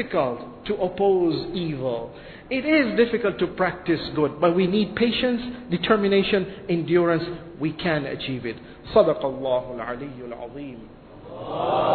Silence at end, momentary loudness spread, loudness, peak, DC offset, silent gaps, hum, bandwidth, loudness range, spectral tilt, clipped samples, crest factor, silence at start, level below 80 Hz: 0 s; 15 LU; -23 LUFS; -4 dBFS; under 0.1%; none; none; 4.6 kHz; 4 LU; -9.5 dB/octave; under 0.1%; 20 dB; 0 s; -50 dBFS